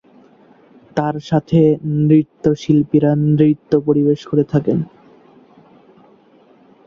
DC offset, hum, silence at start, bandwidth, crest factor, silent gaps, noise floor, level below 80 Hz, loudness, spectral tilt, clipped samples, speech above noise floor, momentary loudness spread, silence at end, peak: under 0.1%; none; 0.95 s; 7 kHz; 16 dB; none; -50 dBFS; -54 dBFS; -16 LUFS; -9.5 dB/octave; under 0.1%; 35 dB; 7 LU; 2.05 s; -2 dBFS